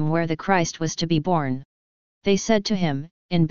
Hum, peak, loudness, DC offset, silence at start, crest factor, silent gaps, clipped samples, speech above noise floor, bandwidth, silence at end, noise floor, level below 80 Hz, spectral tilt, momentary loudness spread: none; -4 dBFS; -23 LUFS; 1%; 0 s; 20 dB; 1.65-2.21 s, 3.11-3.29 s; under 0.1%; over 68 dB; 7.2 kHz; 0 s; under -90 dBFS; -50 dBFS; -5.5 dB/octave; 8 LU